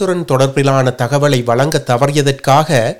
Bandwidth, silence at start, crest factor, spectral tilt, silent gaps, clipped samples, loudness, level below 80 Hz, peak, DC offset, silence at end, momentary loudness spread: 17 kHz; 0 s; 12 dB; -5.5 dB/octave; none; 0.2%; -13 LUFS; -48 dBFS; 0 dBFS; 2%; 0 s; 3 LU